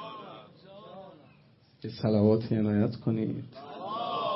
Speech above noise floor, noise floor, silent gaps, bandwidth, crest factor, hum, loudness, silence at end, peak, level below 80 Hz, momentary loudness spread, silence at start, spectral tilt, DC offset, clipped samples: 33 dB; -60 dBFS; none; 5.8 kHz; 20 dB; none; -29 LUFS; 0 s; -10 dBFS; -66 dBFS; 23 LU; 0 s; -11.5 dB/octave; under 0.1%; under 0.1%